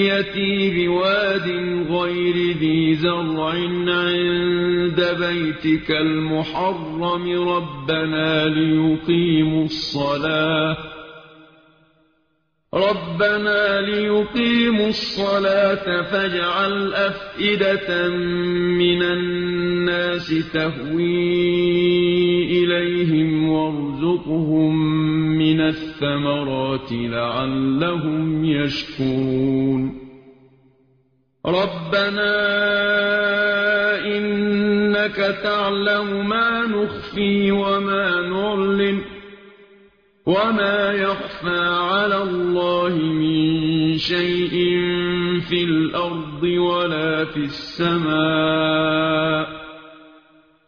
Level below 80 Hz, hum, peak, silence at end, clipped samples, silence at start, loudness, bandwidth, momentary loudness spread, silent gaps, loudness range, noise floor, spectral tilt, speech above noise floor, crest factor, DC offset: -50 dBFS; none; -6 dBFS; 0.7 s; under 0.1%; 0 s; -19 LUFS; 6.8 kHz; 5 LU; none; 3 LU; -68 dBFS; -4 dB/octave; 49 dB; 14 dB; under 0.1%